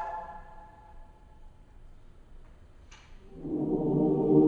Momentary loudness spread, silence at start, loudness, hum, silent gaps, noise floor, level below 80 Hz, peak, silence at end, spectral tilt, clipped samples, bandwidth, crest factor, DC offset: 28 LU; 0 s; -29 LUFS; none; none; -52 dBFS; -50 dBFS; -10 dBFS; 0 s; -10.5 dB/octave; under 0.1%; 6.8 kHz; 22 dB; under 0.1%